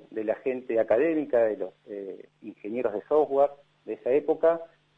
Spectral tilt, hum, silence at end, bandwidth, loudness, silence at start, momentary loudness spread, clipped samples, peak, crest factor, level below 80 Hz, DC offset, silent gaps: -8.5 dB/octave; none; 0.3 s; 4 kHz; -26 LUFS; 0.1 s; 17 LU; under 0.1%; -10 dBFS; 16 dB; -72 dBFS; under 0.1%; none